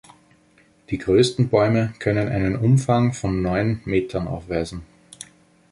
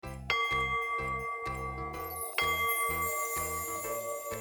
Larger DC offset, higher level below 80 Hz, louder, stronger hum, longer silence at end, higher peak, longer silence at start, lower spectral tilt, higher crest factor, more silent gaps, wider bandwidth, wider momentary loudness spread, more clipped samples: neither; first, -42 dBFS vs -50 dBFS; first, -21 LUFS vs -32 LUFS; neither; first, 0.45 s vs 0 s; first, -4 dBFS vs -16 dBFS; first, 0.9 s vs 0.05 s; first, -7 dB/octave vs -2 dB/octave; about the same, 18 dB vs 18 dB; neither; second, 11.5 kHz vs over 20 kHz; first, 17 LU vs 8 LU; neither